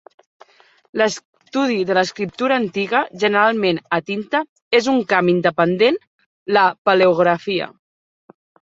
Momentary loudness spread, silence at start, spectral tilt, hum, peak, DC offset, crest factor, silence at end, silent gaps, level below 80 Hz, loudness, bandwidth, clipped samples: 8 LU; 0.95 s; -5 dB/octave; none; -2 dBFS; under 0.1%; 18 dB; 1.05 s; 1.25-1.33 s, 4.49-4.56 s, 4.62-4.71 s, 6.07-6.19 s, 6.26-6.46 s, 6.78-6.85 s; -64 dBFS; -18 LUFS; 8 kHz; under 0.1%